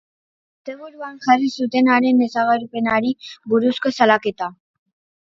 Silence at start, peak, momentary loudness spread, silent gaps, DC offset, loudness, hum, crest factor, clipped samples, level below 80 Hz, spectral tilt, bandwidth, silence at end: 0.65 s; 0 dBFS; 18 LU; none; under 0.1%; -18 LUFS; none; 20 dB; under 0.1%; -64 dBFS; -5 dB/octave; 7.2 kHz; 0.7 s